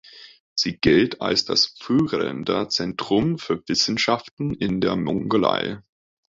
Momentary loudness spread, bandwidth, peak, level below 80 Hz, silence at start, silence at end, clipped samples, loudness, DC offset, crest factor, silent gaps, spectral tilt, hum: 8 LU; 7.8 kHz; -4 dBFS; -50 dBFS; 0.15 s; 0.5 s; under 0.1%; -22 LUFS; under 0.1%; 20 dB; 0.40-0.56 s, 4.31-4.37 s; -4.5 dB/octave; none